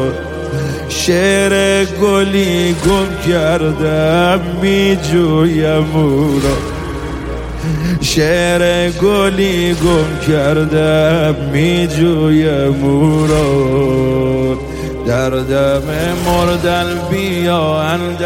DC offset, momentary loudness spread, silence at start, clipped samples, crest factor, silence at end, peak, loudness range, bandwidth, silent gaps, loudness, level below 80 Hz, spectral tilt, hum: under 0.1%; 8 LU; 0 s; under 0.1%; 12 dB; 0 s; -2 dBFS; 2 LU; 16.5 kHz; none; -13 LUFS; -28 dBFS; -5.5 dB/octave; none